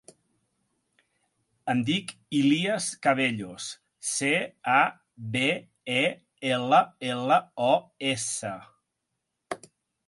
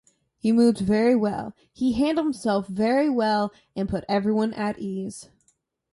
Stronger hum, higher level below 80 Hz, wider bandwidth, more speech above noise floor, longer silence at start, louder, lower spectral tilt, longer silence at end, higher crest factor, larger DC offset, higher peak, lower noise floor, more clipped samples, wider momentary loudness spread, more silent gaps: neither; second, -72 dBFS vs -54 dBFS; about the same, 11.5 kHz vs 11.5 kHz; first, 56 dB vs 45 dB; first, 1.65 s vs 0.45 s; about the same, -26 LUFS vs -24 LUFS; second, -3.5 dB/octave vs -6.5 dB/octave; second, 0.5 s vs 0.7 s; first, 22 dB vs 16 dB; neither; about the same, -6 dBFS vs -8 dBFS; first, -82 dBFS vs -68 dBFS; neither; first, 15 LU vs 12 LU; neither